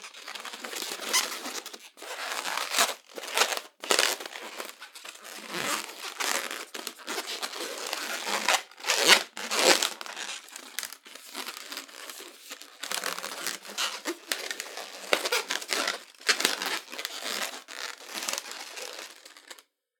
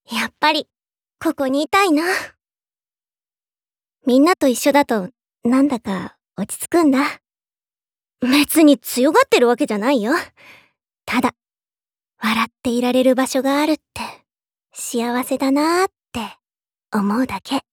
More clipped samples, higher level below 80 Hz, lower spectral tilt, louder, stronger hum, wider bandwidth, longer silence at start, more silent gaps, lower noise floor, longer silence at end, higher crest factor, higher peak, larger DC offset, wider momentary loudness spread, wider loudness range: neither; second, under -90 dBFS vs -60 dBFS; second, 1 dB/octave vs -4 dB/octave; second, -29 LUFS vs -18 LUFS; neither; about the same, 19 kHz vs over 20 kHz; about the same, 0 s vs 0.1 s; neither; second, -52 dBFS vs under -90 dBFS; first, 0.4 s vs 0.1 s; first, 32 dB vs 18 dB; about the same, 0 dBFS vs -2 dBFS; neither; about the same, 17 LU vs 15 LU; first, 10 LU vs 5 LU